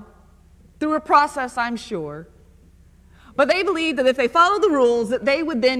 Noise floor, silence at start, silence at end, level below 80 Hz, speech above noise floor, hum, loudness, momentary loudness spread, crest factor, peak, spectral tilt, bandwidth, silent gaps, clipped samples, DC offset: -50 dBFS; 0 s; 0 s; -52 dBFS; 31 dB; none; -19 LUFS; 13 LU; 18 dB; -2 dBFS; -4 dB/octave; 13 kHz; none; under 0.1%; under 0.1%